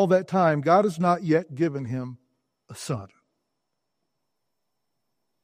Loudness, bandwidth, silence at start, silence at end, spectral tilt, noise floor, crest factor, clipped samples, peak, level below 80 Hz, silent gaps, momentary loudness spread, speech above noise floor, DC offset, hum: -24 LUFS; 15 kHz; 0 s; 2.4 s; -7 dB/octave; -82 dBFS; 20 dB; under 0.1%; -6 dBFS; -70 dBFS; none; 13 LU; 59 dB; under 0.1%; none